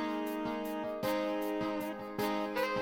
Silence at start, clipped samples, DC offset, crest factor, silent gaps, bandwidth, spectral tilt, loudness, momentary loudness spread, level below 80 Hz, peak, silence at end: 0 s; under 0.1%; under 0.1%; 14 dB; none; 17 kHz; -5 dB/octave; -36 LUFS; 4 LU; -66 dBFS; -22 dBFS; 0 s